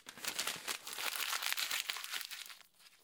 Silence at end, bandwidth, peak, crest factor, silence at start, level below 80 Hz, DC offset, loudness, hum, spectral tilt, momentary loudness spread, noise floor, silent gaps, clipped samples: 0.05 s; 19 kHz; -14 dBFS; 28 dB; 0.05 s; -84 dBFS; under 0.1%; -38 LUFS; none; 2 dB/octave; 11 LU; -62 dBFS; none; under 0.1%